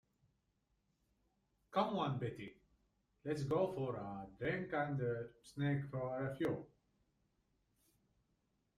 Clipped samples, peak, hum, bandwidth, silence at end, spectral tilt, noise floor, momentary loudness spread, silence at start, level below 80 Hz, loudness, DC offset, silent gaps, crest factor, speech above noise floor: under 0.1%; -22 dBFS; none; 12 kHz; 2.1 s; -7.5 dB/octave; -82 dBFS; 10 LU; 1.7 s; -72 dBFS; -41 LUFS; under 0.1%; none; 20 dB; 42 dB